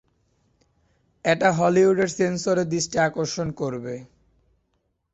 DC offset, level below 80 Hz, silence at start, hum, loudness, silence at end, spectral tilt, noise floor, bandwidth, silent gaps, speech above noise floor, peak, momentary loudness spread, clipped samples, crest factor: under 0.1%; -58 dBFS; 1.25 s; none; -22 LUFS; 1.1 s; -5 dB/octave; -72 dBFS; 8.2 kHz; none; 51 dB; -6 dBFS; 11 LU; under 0.1%; 18 dB